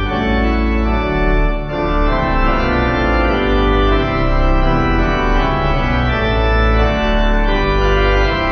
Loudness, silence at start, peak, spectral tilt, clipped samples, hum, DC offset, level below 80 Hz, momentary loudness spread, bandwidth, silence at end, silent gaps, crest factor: -16 LUFS; 0 s; -2 dBFS; -7.5 dB/octave; under 0.1%; none; under 0.1%; -16 dBFS; 3 LU; 6.2 kHz; 0 s; none; 12 dB